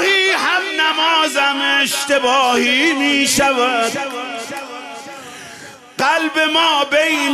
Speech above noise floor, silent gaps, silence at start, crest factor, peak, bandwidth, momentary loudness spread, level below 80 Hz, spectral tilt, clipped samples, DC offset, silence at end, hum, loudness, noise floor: 21 dB; none; 0 s; 12 dB; -4 dBFS; 14 kHz; 18 LU; -56 dBFS; -1 dB/octave; under 0.1%; under 0.1%; 0 s; none; -14 LUFS; -37 dBFS